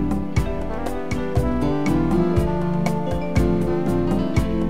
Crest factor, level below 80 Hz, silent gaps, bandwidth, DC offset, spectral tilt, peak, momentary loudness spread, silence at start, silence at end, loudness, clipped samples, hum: 16 dB; -30 dBFS; none; 15.5 kHz; 3%; -8 dB/octave; -6 dBFS; 7 LU; 0 s; 0 s; -22 LUFS; under 0.1%; none